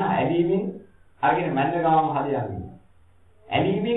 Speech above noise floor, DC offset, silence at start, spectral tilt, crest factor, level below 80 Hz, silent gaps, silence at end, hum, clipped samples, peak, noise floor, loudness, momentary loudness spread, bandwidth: 35 dB; 0.2%; 0 s; -10 dB/octave; 18 dB; -56 dBFS; none; 0 s; none; under 0.1%; -6 dBFS; -58 dBFS; -23 LUFS; 13 LU; 4 kHz